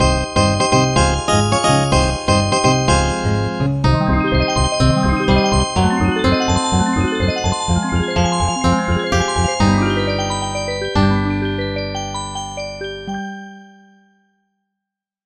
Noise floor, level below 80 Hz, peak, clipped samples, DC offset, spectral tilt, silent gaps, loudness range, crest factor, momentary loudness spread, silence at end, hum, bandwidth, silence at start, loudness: -83 dBFS; -28 dBFS; 0 dBFS; under 0.1%; under 0.1%; -5 dB/octave; none; 7 LU; 16 dB; 10 LU; 1.6 s; none; 10.5 kHz; 0 s; -17 LUFS